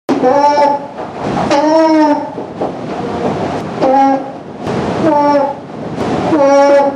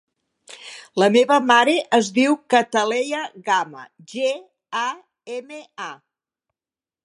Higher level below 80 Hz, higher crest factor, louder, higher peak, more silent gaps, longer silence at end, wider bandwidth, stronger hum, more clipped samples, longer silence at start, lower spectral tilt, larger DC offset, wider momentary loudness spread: first, -46 dBFS vs -78 dBFS; second, 12 dB vs 20 dB; first, -12 LUFS vs -19 LUFS; about the same, 0 dBFS vs -2 dBFS; neither; second, 0 s vs 1.1 s; about the same, 10.5 kHz vs 11.5 kHz; neither; neither; second, 0.1 s vs 0.5 s; first, -6.5 dB/octave vs -3.5 dB/octave; neither; second, 12 LU vs 19 LU